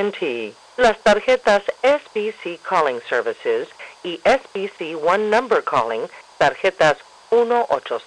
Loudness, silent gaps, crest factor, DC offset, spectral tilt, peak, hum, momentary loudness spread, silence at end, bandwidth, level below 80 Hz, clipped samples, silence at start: -19 LUFS; none; 12 dB; under 0.1%; -4 dB/octave; -6 dBFS; none; 12 LU; 0.05 s; 10.5 kHz; -54 dBFS; under 0.1%; 0 s